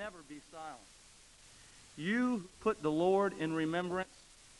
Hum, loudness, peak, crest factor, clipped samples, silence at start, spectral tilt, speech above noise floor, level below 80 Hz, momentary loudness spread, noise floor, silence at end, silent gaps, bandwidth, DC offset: none; -35 LUFS; -18 dBFS; 18 dB; under 0.1%; 0 s; -6 dB/octave; 25 dB; -68 dBFS; 22 LU; -60 dBFS; 0.55 s; none; 11.5 kHz; under 0.1%